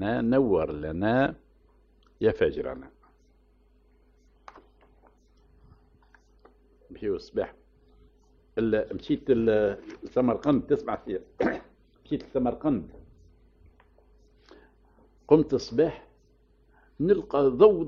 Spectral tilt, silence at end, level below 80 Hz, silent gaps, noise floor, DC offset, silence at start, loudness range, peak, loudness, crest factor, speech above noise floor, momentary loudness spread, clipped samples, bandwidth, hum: -6.5 dB/octave; 0 s; -52 dBFS; none; -62 dBFS; under 0.1%; 0 s; 12 LU; -6 dBFS; -27 LUFS; 24 dB; 37 dB; 14 LU; under 0.1%; 6.8 kHz; none